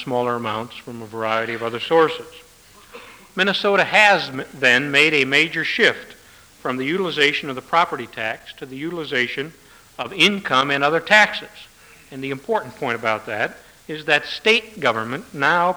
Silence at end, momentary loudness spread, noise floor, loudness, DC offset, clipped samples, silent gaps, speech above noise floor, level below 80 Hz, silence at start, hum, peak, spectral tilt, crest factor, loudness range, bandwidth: 0 s; 17 LU; -48 dBFS; -19 LUFS; under 0.1%; under 0.1%; none; 28 dB; -60 dBFS; 0 s; none; -2 dBFS; -3.5 dB/octave; 20 dB; 6 LU; over 20 kHz